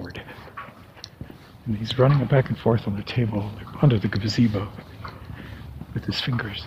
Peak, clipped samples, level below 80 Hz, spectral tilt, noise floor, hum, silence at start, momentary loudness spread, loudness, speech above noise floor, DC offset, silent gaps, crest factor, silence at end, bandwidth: -4 dBFS; under 0.1%; -46 dBFS; -7.5 dB/octave; -44 dBFS; none; 0 s; 20 LU; -23 LUFS; 22 dB; under 0.1%; none; 20 dB; 0 s; 14.5 kHz